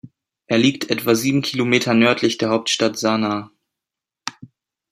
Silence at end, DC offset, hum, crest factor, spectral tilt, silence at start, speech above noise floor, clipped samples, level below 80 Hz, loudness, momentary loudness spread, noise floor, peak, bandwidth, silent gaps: 0.45 s; under 0.1%; none; 18 dB; -4.5 dB/octave; 0.05 s; 68 dB; under 0.1%; -62 dBFS; -18 LUFS; 14 LU; -86 dBFS; -2 dBFS; 16 kHz; none